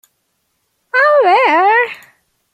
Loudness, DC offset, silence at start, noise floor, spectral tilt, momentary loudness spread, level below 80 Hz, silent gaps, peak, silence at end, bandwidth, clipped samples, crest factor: -11 LUFS; under 0.1%; 0.95 s; -66 dBFS; -2.5 dB/octave; 10 LU; -74 dBFS; none; 0 dBFS; 0.6 s; 15 kHz; under 0.1%; 14 dB